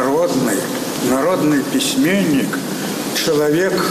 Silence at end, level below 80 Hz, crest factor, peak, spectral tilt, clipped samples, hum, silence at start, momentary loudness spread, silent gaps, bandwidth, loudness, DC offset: 0 s; -54 dBFS; 10 dB; -8 dBFS; -4 dB/octave; under 0.1%; none; 0 s; 6 LU; none; 15 kHz; -17 LUFS; under 0.1%